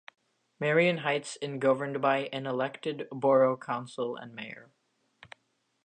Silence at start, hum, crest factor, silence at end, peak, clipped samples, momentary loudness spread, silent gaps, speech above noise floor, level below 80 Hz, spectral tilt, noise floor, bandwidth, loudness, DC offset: 0.6 s; none; 18 dB; 1.2 s; -12 dBFS; under 0.1%; 15 LU; none; 46 dB; -82 dBFS; -5.5 dB/octave; -75 dBFS; 9.6 kHz; -29 LUFS; under 0.1%